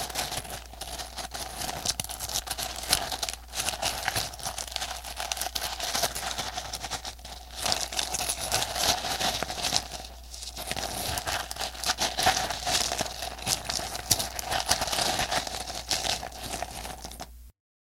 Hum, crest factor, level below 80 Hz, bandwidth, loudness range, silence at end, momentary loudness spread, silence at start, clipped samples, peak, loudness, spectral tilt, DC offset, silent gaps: none; 32 dB; -46 dBFS; 17 kHz; 4 LU; 0.35 s; 11 LU; 0 s; under 0.1%; 0 dBFS; -29 LUFS; -1 dB/octave; under 0.1%; none